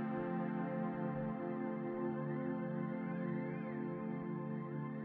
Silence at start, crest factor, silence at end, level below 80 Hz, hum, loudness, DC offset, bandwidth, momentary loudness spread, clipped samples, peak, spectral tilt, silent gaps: 0 s; 12 dB; 0 s; -72 dBFS; none; -41 LUFS; under 0.1%; 4.4 kHz; 3 LU; under 0.1%; -28 dBFS; -8.5 dB/octave; none